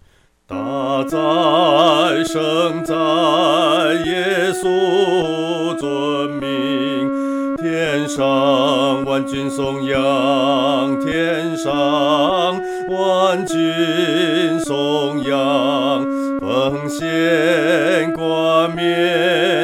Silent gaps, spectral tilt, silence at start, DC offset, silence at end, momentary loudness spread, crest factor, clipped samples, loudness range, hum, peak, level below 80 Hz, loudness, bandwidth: none; -5 dB/octave; 0.5 s; under 0.1%; 0 s; 6 LU; 16 dB; under 0.1%; 3 LU; none; -2 dBFS; -52 dBFS; -17 LUFS; 16 kHz